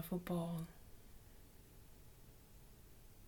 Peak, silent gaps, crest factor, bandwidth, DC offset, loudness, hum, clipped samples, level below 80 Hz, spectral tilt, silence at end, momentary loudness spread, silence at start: -28 dBFS; none; 20 dB; 19 kHz; under 0.1%; -44 LUFS; none; under 0.1%; -62 dBFS; -7 dB/octave; 0 s; 21 LU; 0 s